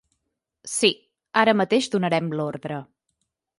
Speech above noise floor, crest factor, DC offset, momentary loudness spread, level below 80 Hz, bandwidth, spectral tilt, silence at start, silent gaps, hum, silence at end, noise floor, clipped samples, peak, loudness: 57 dB; 22 dB; under 0.1%; 15 LU; -70 dBFS; 11.5 kHz; -4 dB/octave; 0.65 s; none; none; 0.75 s; -79 dBFS; under 0.1%; -4 dBFS; -22 LUFS